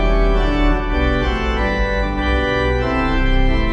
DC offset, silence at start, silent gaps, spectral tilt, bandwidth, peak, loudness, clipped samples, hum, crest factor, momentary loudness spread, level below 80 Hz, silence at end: under 0.1%; 0 s; none; -7 dB/octave; 7.4 kHz; -4 dBFS; -18 LUFS; under 0.1%; none; 12 dB; 2 LU; -18 dBFS; 0 s